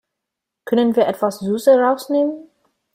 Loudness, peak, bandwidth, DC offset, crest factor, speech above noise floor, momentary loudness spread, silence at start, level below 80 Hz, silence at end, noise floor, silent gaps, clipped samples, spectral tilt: -17 LUFS; -2 dBFS; 16 kHz; under 0.1%; 16 dB; 65 dB; 8 LU; 0.65 s; -64 dBFS; 0.5 s; -82 dBFS; none; under 0.1%; -6 dB/octave